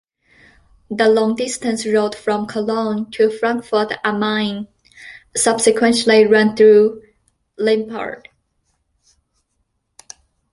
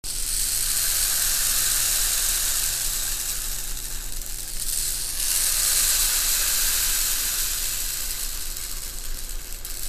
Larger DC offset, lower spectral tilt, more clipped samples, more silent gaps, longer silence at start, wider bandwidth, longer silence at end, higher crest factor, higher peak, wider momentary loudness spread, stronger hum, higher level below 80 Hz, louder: neither; first, -3.5 dB/octave vs 1 dB/octave; neither; neither; first, 0.9 s vs 0.05 s; second, 11.5 kHz vs 15.5 kHz; first, 2.35 s vs 0 s; about the same, 18 dB vs 18 dB; first, 0 dBFS vs -6 dBFS; first, 18 LU vs 12 LU; neither; second, -58 dBFS vs -34 dBFS; first, -16 LUFS vs -22 LUFS